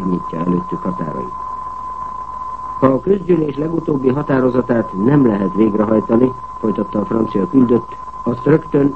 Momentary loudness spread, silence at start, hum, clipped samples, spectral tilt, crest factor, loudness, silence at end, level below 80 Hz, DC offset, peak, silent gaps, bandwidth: 12 LU; 0 s; none; under 0.1%; -10 dB/octave; 16 dB; -17 LUFS; 0 s; -44 dBFS; 1%; 0 dBFS; none; 8 kHz